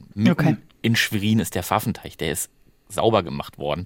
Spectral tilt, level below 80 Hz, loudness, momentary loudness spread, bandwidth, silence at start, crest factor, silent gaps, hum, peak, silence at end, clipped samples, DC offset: -5 dB/octave; -52 dBFS; -23 LUFS; 10 LU; 17 kHz; 0 s; 20 dB; none; none; -2 dBFS; 0 s; under 0.1%; under 0.1%